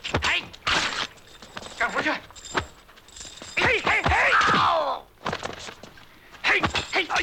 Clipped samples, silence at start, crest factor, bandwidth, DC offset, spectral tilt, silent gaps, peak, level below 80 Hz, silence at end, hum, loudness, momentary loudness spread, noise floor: under 0.1%; 0.05 s; 16 dB; 17.5 kHz; under 0.1%; -3 dB/octave; none; -8 dBFS; -44 dBFS; 0 s; none; -23 LUFS; 20 LU; -49 dBFS